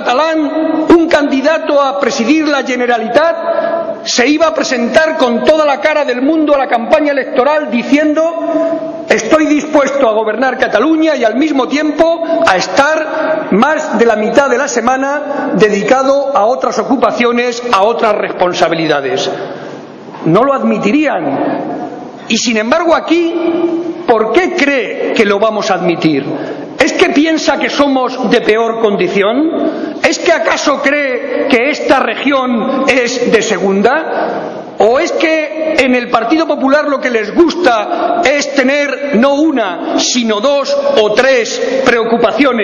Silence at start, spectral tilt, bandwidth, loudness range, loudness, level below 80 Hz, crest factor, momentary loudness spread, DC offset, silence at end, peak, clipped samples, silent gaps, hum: 0 s; -4 dB/octave; 11 kHz; 2 LU; -11 LUFS; -48 dBFS; 12 dB; 5 LU; under 0.1%; 0 s; 0 dBFS; 0.6%; none; none